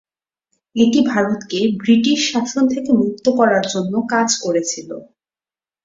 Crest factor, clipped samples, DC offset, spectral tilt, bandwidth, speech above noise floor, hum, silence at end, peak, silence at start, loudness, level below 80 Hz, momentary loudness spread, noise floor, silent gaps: 16 dB; under 0.1%; under 0.1%; -4 dB/octave; 7.8 kHz; over 74 dB; none; 0.8 s; -2 dBFS; 0.75 s; -17 LUFS; -60 dBFS; 8 LU; under -90 dBFS; none